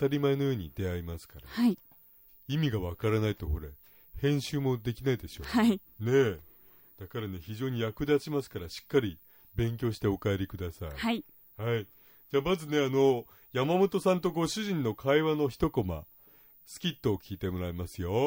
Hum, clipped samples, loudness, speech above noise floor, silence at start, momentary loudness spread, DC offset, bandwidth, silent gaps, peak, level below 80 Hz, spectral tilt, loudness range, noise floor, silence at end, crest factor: none; under 0.1%; -31 LUFS; 28 dB; 0 s; 14 LU; under 0.1%; 16 kHz; none; -12 dBFS; -52 dBFS; -6.5 dB/octave; 5 LU; -58 dBFS; 0 s; 18 dB